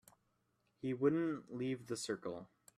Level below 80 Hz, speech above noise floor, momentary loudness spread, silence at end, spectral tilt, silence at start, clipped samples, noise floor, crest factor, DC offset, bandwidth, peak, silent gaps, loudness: -80 dBFS; 42 dB; 12 LU; 0.3 s; -5.5 dB/octave; 0.85 s; under 0.1%; -80 dBFS; 20 dB; under 0.1%; 14 kHz; -22 dBFS; none; -40 LUFS